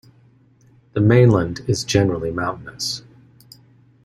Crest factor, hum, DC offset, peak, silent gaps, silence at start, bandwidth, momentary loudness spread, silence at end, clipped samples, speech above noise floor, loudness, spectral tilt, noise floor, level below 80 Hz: 18 dB; none; under 0.1%; -2 dBFS; none; 0.95 s; 13 kHz; 13 LU; 1.05 s; under 0.1%; 36 dB; -19 LUFS; -6 dB/octave; -54 dBFS; -48 dBFS